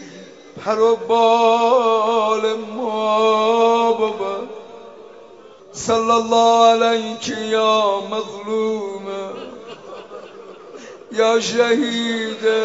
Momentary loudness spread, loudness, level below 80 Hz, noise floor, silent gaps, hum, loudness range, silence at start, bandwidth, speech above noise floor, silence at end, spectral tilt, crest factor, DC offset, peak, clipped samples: 22 LU; -17 LUFS; -64 dBFS; -43 dBFS; none; none; 7 LU; 0 s; 8 kHz; 26 dB; 0 s; -3.5 dB/octave; 16 dB; 0.1%; -2 dBFS; under 0.1%